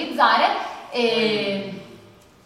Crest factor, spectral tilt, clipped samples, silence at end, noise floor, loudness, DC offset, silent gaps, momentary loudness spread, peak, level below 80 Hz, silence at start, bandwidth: 18 dB; -4.5 dB/octave; under 0.1%; 0.5 s; -49 dBFS; -21 LUFS; under 0.1%; none; 14 LU; -4 dBFS; -64 dBFS; 0 s; 15 kHz